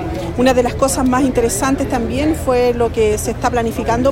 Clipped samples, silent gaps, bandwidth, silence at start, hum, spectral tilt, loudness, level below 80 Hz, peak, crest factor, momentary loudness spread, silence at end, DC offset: under 0.1%; none; 16.5 kHz; 0 s; none; -5 dB/octave; -16 LUFS; -30 dBFS; 0 dBFS; 14 dB; 4 LU; 0 s; under 0.1%